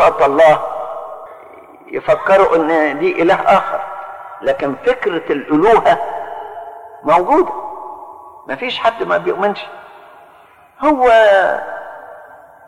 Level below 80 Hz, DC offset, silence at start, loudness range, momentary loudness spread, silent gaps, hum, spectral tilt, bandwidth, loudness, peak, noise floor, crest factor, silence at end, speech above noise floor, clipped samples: -48 dBFS; under 0.1%; 0 s; 4 LU; 21 LU; none; none; -5.5 dB/octave; 12 kHz; -14 LUFS; -2 dBFS; -45 dBFS; 14 dB; 0.45 s; 32 dB; under 0.1%